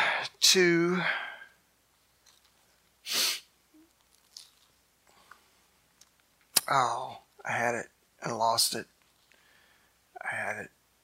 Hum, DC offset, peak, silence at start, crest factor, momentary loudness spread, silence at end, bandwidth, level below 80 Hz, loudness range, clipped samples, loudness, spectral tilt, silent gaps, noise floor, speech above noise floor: none; under 0.1%; -4 dBFS; 0 s; 30 dB; 25 LU; 0.35 s; 16 kHz; -78 dBFS; 8 LU; under 0.1%; -28 LUFS; -2 dB/octave; none; -68 dBFS; 40 dB